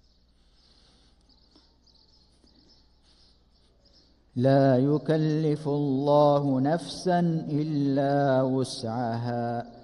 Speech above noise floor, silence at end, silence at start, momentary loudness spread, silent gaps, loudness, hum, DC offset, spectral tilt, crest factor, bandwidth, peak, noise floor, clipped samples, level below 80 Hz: 37 dB; 0.05 s; 4.35 s; 9 LU; none; -25 LUFS; 60 Hz at -60 dBFS; under 0.1%; -7.5 dB/octave; 18 dB; 11.5 kHz; -10 dBFS; -62 dBFS; under 0.1%; -62 dBFS